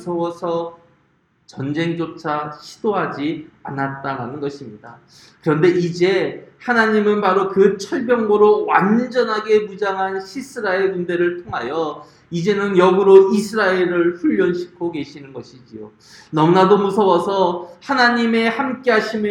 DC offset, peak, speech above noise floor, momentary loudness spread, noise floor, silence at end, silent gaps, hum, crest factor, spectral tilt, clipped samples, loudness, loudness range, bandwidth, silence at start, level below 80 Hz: under 0.1%; 0 dBFS; 43 dB; 15 LU; -61 dBFS; 0 s; none; none; 18 dB; -6.5 dB/octave; under 0.1%; -17 LUFS; 8 LU; 11 kHz; 0 s; -60 dBFS